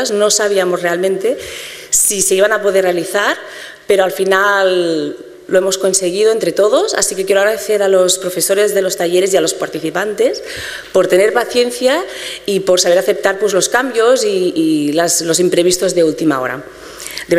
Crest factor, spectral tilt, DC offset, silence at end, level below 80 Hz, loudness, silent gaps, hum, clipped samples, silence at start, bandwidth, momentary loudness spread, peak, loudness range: 14 dB; -2.5 dB/octave; under 0.1%; 0 s; -52 dBFS; -13 LUFS; none; none; under 0.1%; 0 s; 16 kHz; 11 LU; 0 dBFS; 2 LU